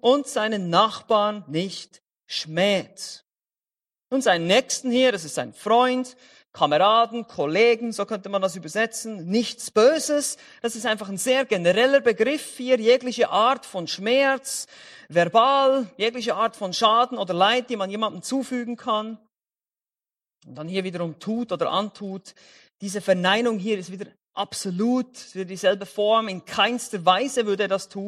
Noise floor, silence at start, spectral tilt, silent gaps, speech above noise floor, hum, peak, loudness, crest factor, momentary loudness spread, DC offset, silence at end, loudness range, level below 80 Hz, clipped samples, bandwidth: under -90 dBFS; 0.05 s; -3.5 dB/octave; none; over 67 dB; none; -4 dBFS; -22 LUFS; 20 dB; 12 LU; under 0.1%; 0 s; 8 LU; -72 dBFS; under 0.1%; 14 kHz